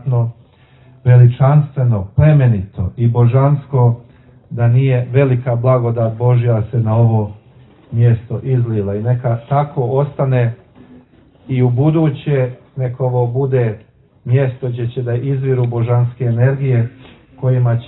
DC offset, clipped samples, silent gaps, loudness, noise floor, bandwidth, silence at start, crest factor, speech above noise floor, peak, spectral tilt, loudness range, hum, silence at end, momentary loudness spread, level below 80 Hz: under 0.1%; under 0.1%; none; -15 LUFS; -46 dBFS; 4 kHz; 0.05 s; 14 dB; 33 dB; 0 dBFS; -13 dB/octave; 4 LU; none; 0 s; 9 LU; -44 dBFS